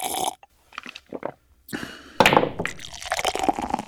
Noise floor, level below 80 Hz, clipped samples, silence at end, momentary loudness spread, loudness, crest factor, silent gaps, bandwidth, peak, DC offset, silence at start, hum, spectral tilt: -43 dBFS; -50 dBFS; under 0.1%; 0 s; 20 LU; -23 LUFS; 24 dB; none; over 20 kHz; 0 dBFS; under 0.1%; 0 s; none; -3 dB/octave